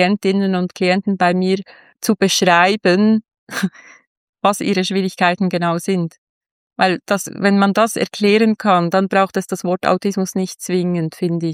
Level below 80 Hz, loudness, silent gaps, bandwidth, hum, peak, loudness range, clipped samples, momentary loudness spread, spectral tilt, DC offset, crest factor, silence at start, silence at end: -66 dBFS; -17 LUFS; 3.38-3.47 s, 4.07-4.33 s, 6.18-6.41 s, 6.51-6.70 s; 16 kHz; none; -2 dBFS; 3 LU; under 0.1%; 8 LU; -5 dB/octave; under 0.1%; 16 dB; 0 s; 0 s